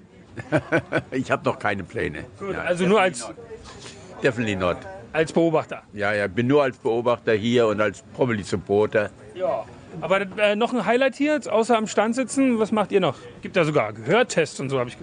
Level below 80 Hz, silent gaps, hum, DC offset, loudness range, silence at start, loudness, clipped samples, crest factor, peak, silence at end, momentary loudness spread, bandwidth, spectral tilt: -52 dBFS; none; none; under 0.1%; 3 LU; 0.2 s; -23 LUFS; under 0.1%; 18 dB; -4 dBFS; 0 s; 13 LU; 10.5 kHz; -5.5 dB/octave